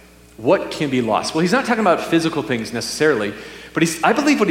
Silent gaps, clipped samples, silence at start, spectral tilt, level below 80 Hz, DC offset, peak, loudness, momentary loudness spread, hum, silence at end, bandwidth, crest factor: none; under 0.1%; 0.4 s; -4.5 dB/octave; -52 dBFS; under 0.1%; -2 dBFS; -18 LUFS; 8 LU; none; 0 s; 16.5 kHz; 18 dB